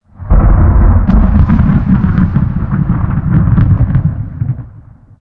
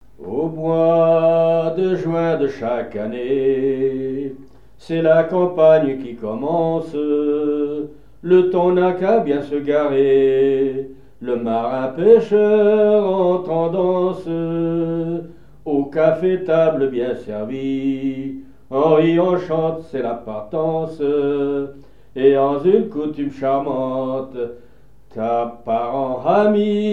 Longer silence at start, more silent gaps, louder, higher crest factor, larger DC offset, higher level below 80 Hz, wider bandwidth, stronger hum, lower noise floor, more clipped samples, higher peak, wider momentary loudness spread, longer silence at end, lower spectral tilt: about the same, 0.2 s vs 0.2 s; neither; first, -11 LUFS vs -18 LUFS; second, 10 dB vs 18 dB; second, under 0.1% vs 0.7%; first, -14 dBFS vs -54 dBFS; second, 3.6 kHz vs 6.6 kHz; neither; second, -36 dBFS vs -40 dBFS; neither; about the same, 0 dBFS vs 0 dBFS; second, 9 LU vs 12 LU; first, 0.5 s vs 0 s; first, -12 dB/octave vs -9 dB/octave